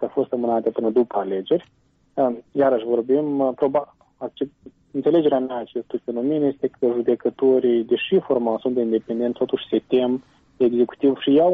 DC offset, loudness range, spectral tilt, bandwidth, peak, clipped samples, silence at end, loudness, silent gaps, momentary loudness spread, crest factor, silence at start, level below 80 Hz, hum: under 0.1%; 2 LU; -9 dB/octave; 3.9 kHz; -8 dBFS; under 0.1%; 0 s; -22 LUFS; none; 10 LU; 14 dB; 0 s; -64 dBFS; none